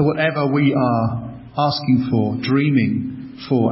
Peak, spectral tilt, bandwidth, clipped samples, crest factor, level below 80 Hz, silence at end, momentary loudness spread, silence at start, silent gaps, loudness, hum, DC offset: -4 dBFS; -11 dB/octave; 5.8 kHz; under 0.1%; 14 dB; -48 dBFS; 0 s; 11 LU; 0 s; none; -19 LUFS; none; under 0.1%